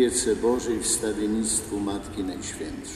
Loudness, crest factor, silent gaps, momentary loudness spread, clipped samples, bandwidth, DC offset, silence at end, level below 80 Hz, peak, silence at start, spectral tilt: -26 LUFS; 16 dB; none; 9 LU; under 0.1%; 14 kHz; under 0.1%; 0 s; -46 dBFS; -10 dBFS; 0 s; -3.5 dB/octave